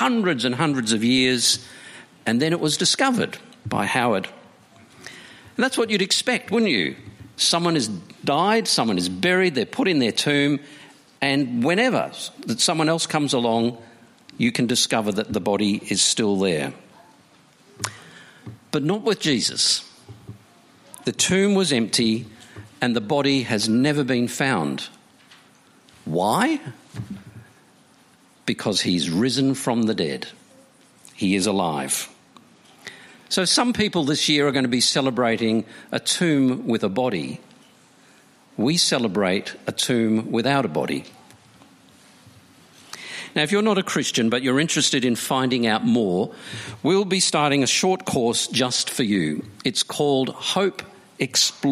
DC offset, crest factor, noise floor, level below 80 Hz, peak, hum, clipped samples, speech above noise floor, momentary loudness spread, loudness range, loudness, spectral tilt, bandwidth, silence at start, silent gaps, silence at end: under 0.1%; 20 dB; -55 dBFS; -62 dBFS; -4 dBFS; none; under 0.1%; 34 dB; 13 LU; 5 LU; -21 LUFS; -3.5 dB/octave; 15.5 kHz; 0 s; none; 0 s